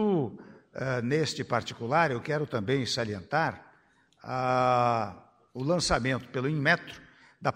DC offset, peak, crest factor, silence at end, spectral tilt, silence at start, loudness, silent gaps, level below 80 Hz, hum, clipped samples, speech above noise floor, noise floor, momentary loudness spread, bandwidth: under 0.1%; -8 dBFS; 20 dB; 0 s; -5 dB/octave; 0 s; -29 LUFS; none; -54 dBFS; none; under 0.1%; 36 dB; -64 dBFS; 16 LU; 15 kHz